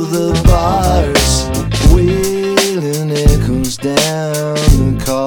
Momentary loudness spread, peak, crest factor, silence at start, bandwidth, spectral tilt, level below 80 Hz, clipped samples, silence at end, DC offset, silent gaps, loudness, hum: 5 LU; 0 dBFS; 12 dB; 0 s; 20 kHz; -5 dB/octave; -16 dBFS; under 0.1%; 0 s; under 0.1%; none; -13 LUFS; none